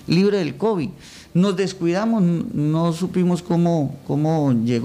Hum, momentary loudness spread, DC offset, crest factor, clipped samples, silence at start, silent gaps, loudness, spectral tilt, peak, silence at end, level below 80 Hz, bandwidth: none; 5 LU; under 0.1%; 12 dB; under 0.1%; 0.05 s; none; -20 LUFS; -7.5 dB/octave; -6 dBFS; 0 s; -54 dBFS; 11.5 kHz